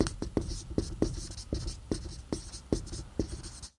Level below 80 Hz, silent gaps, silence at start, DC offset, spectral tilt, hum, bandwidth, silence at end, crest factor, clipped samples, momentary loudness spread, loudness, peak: -42 dBFS; none; 0 s; under 0.1%; -5.5 dB/octave; none; 11.5 kHz; 0.1 s; 24 dB; under 0.1%; 6 LU; -37 LUFS; -10 dBFS